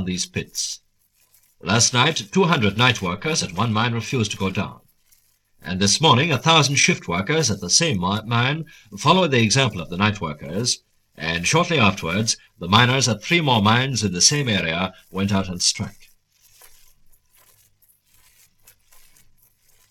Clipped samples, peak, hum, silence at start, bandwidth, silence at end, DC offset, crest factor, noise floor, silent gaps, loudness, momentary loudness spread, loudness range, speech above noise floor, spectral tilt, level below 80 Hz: under 0.1%; 0 dBFS; 50 Hz at -45 dBFS; 0 s; 16 kHz; 4 s; under 0.1%; 22 dB; -62 dBFS; none; -19 LUFS; 11 LU; 5 LU; 43 dB; -3.5 dB/octave; -52 dBFS